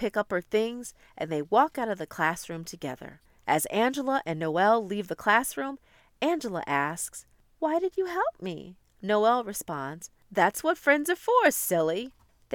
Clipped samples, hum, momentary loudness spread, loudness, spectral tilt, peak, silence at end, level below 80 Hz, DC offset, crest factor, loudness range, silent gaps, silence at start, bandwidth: under 0.1%; none; 14 LU; -27 LUFS; -4 dB/octave; -8 dBFS; 0 s; -64 dBFS; under 0.1%; 20 dB; 4 LU; none; 0 s; 19 kHz